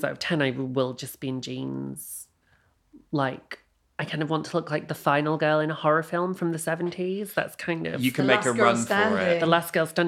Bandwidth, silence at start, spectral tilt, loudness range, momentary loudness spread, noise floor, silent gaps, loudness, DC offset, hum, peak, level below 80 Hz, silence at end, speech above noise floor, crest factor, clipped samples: 16.5 kHz; 0 s; -5 dB/octave; 9 LU; 13 LU; -65 dBFS; none; -26 LUFS; under 0.1%; none; -4 dBFS; -68 dBFS; 0 s; 39 dB; 24 dB; under 0.1%